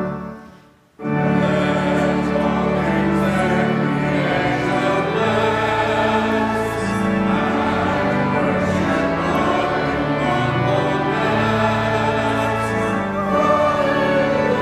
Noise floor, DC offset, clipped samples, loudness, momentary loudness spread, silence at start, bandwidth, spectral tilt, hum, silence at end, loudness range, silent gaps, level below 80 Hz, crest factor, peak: -48 dBFS; under 0.1%; under 0.1%; -18 LUFS; 3 LU; 0 s; 14 kHz; -6.5 dB/octave; none; 0 s; 1 LU; none; -42 dBFS; 14 dB; -4 dBFS